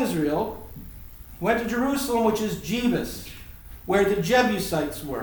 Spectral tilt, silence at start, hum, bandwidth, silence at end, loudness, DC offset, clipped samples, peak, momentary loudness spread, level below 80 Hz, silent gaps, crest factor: -5 dB/octave; 0 s; none; over 20 kHz; 0 s; -24 LUFS; under 0.1%; under 0.1%; -6 dBFS; 21 LU; -46 dBFS; none; 18 dB